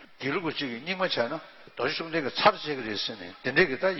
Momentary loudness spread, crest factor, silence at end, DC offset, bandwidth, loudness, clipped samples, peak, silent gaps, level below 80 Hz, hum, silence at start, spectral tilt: 10 LU; 24 dB; 0 s; under 0.1%; 6 kHz; -28 LUFS; under 0.1%; -6 dBFS; none; -60 dBFS; none; 0 s; -5.5 dB/octave